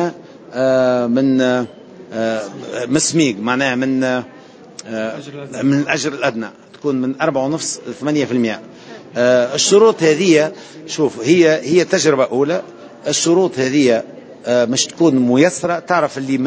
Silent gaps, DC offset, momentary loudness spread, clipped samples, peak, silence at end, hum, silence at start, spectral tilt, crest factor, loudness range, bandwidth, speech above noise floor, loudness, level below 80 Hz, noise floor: none; under 0.1%; 15 LU; under 0.1%; 0 dBFS; 0 s; none; 0 s; -4 dB/octave; 16 dB; 6 LU; 8 kHz; 22 dB; -16 LUFS; -62 dBFS; -37 dBFS